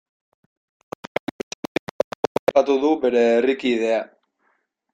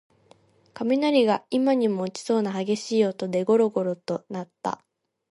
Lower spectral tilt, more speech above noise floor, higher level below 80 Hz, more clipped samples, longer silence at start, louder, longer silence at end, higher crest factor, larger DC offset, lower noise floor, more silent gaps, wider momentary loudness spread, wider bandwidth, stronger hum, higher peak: about the same, -5 dB/octave vs -6 dB/octave; first, 50 dB vs 35 dB; first, -64 dBFS vs -74 dBFS; neither; first, 2.5 s vs 0.75 s; first, -21 LUFS vs -24 LUFS; first, 0.9 s vs 0.55 s; about the same, 20 dB vs 16 dB; neither; first, -68 dBFS vs -58 dBFS; neither; first, 15 LU vs 11 LU; first, 15 kHz vs 11.5 kHz; neither; first, -4 dBFS vs -8 dBFS